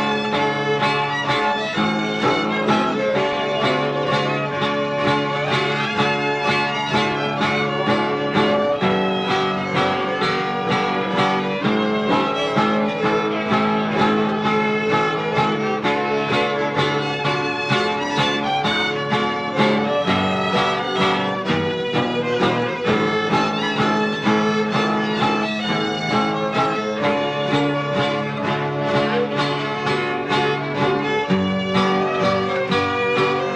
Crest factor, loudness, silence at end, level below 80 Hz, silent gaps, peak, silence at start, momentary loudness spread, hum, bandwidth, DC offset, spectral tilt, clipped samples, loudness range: 14 dB; -20 LUFS; 0 s; -54 dBFS; none; -6 dBFS; 0 s; 2 LU; none; 9.8 kHz; under 0.1%; -5.5 dB/octave; under 0.1%; 1 LU